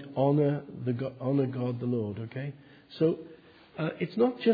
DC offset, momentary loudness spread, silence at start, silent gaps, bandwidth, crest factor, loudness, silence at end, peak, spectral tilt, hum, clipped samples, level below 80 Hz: under 0.1%; 13 LU; 0 s; none; 5 kHz; 18 dB; -30 LUFS; 0 s; -12 dBFS; -10.5 dB/octave; none; under 0.1%; -70 dBFS